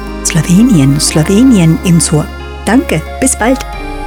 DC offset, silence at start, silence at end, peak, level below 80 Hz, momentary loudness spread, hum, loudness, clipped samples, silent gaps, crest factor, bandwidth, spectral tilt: under 0.1%; 0 s; 0 s; 0 dBFS; -24 dBFS; 9 LU; none; -9 LUFS; 0.4%; none; 10 dB; 18 kHz; -5 dB/octave